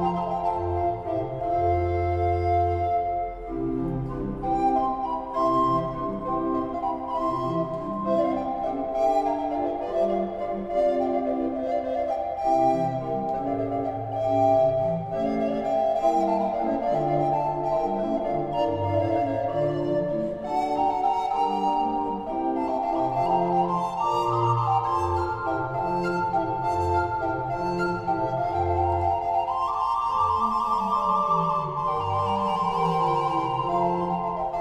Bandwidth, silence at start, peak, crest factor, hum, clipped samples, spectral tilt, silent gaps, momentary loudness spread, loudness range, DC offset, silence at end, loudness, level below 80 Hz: 10 kHz; 0 s; -10 dBFS; 14 dB; none; under 0.1%; -8 dB/octave; none; 5 LU; 2 LU; under 0.1%; 0 s; -25 LUFS; -46 dBFS